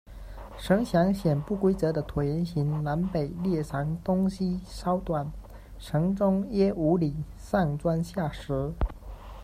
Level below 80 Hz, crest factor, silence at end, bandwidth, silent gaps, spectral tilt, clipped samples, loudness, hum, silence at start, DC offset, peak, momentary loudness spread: -42 dBFS; 18 dB; 0 s; 15 kHz; none; -8 dB/octave; under 0.1%; -28 LUFS; none; 0.05 s; under 0.1%; -10 dBFS; 14 LU